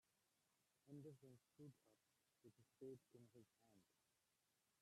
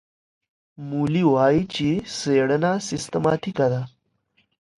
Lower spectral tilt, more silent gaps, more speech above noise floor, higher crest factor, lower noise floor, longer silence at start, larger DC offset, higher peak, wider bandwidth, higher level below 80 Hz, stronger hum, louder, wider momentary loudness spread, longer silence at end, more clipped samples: about the same, -7 dB/octave vs -6 dB/octave; neither; second, 21 dB vs 46 dB; about the same, 20 dB vs 18 dB; first, -88 dBFS vs -67 dBFS; second, 0.1 s vs 0.8 s; neither; second, -48 dBFS vs -6 dBFS; first, 13 kHz vs 11.5 kHz; second, under -90 dBFS vs -56 dBFS; neither; second, -64 LUFS vs -22 LUFS; second, 5 LU vs 10 LU; second, 0.05 s vs 0.9 s; neither